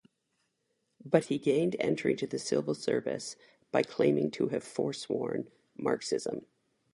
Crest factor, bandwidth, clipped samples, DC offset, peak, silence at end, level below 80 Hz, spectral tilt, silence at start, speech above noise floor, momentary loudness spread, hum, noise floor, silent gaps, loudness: 24 dB; 11.5 kHz; under 0.1%; under 0.1%; -8 dBFS; 0.5 s; -74 dBFS; -5.5 dB/octave; 1.05 s; 48 dB; 11 LU; none; -79 dBFS; none; -32 LUFS